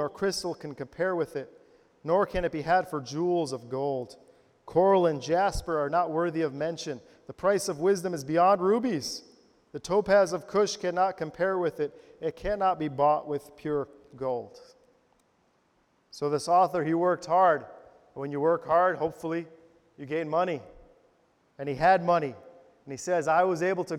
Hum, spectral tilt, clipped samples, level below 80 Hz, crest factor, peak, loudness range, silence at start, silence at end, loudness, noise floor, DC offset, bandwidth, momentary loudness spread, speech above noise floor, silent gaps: none; -5.5 dB/octave; under 0.1%; -54 dBFS; 18 dB; -10 dBFS; 4 LU; 0 s; 0 s; -27 LUFS; -69 dBFS; under 0.1%; 15.5 kHz; 15 LU; 42 dB; none